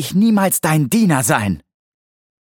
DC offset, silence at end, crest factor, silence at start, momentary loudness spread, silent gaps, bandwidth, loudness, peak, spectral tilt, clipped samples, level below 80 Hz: under 0.1%; 0.85 s; 16 dB; 0 s; 7 LU; none; 17.5 kHz; -15 LUFS; -2 dBFS; -5 dB/octave; under 0.1%; -50 dBFS